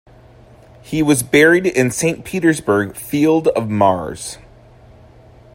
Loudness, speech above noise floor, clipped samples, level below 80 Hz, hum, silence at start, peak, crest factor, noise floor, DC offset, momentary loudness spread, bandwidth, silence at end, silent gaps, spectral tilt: -16 LUFS; 29 dB; under 0.1%; -48 dBFS; none; 0.85 s; 0 dBFS; 18 dB; -44 dBFS; under 0.1%; 14 LU; 16.5 kHz; 1.2 s; none; -5 dB/octave